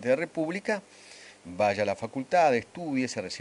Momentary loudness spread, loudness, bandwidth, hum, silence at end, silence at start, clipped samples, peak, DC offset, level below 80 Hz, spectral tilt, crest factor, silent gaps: 23 LU; -28 LUFS; 11 kHz; 50 Hz at -55 dBFS; 0 s; 0 s; under 0.1%; -12 dBFS; under 0.1%; -70 dBFS; -5 dB/octave; 18 dB; none